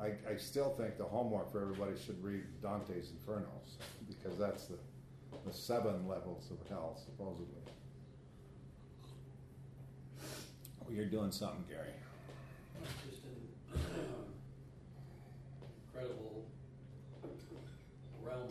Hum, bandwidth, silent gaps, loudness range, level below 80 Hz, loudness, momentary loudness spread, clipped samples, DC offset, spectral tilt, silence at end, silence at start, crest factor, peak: none; 13.5 kHz; none; 9 LU; -62 dBFS; -45 LUFS; 17 LU; under 0.1%; under 0.1%; -6 dB/octave; 0 s; 0 s; 20 dB; -26 dBFS